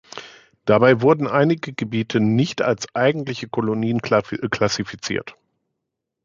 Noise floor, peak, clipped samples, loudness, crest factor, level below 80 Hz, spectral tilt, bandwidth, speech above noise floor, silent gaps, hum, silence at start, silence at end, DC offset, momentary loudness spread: -80 dBFS; -2 dBFS; under 0.1%; -20 LUFS; 18 dB; -56 dBFS; -6 dB/octave; 7.6 kHz; 61 dB; none; none; 0.15 s; 0.95 s; under 0.1%; 11 LU